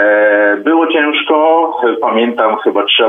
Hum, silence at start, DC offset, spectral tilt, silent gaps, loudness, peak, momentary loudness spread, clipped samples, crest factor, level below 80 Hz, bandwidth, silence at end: none; 0 s; under 0.1%; -6 dB/octave; none; -11 LUFS; 0 dBFS; 4 LU; under 0.1%; 10 dB; -66 dBFS; 3.8 kHz; 0 s